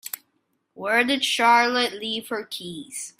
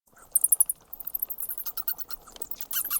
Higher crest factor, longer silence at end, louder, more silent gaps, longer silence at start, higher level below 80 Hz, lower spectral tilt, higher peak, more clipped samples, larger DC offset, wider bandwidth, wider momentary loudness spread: second, 18 dB vs 24 dB; about the same, 0.1 s vs 0 s; first, -21 LUFS vs -27 LUFS; neither; second, 0.05 s vs 0.35 s; second, -72 dBFS vs -62 dBFS; first, -1.5 dB/octave vs 2 dB/octave; about the same, -6 dBFS vs -6 dBFS; neither; neither; second, 16 kHz vs 19 kHz; about the same, 16 LU vs 14 LU